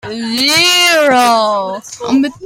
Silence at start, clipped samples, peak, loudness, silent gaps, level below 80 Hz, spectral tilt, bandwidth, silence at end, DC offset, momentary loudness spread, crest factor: 0.05 s; under 0.1%; 0 dBFS; -10 LUFS; none; -56 dBFS; -1.5 dB/octave; 16.5 kHz; 0 s; under 0.1%; 11 LU; 12 dB